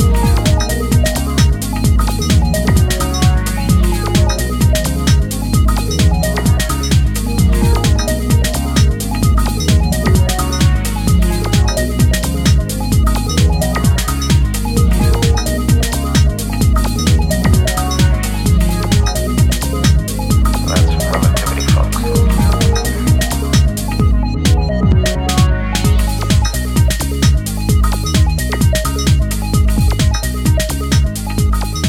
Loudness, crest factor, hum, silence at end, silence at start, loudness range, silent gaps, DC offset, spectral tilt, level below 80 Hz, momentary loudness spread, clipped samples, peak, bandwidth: -14 LUFS; 12 dB; none; 0 s; 0 s; 1 LU; none; under 0.1%; -5 dB/octave; -16 dBFS; 3 LU; under 0.1%; 0 dBFS; 16.5 kHz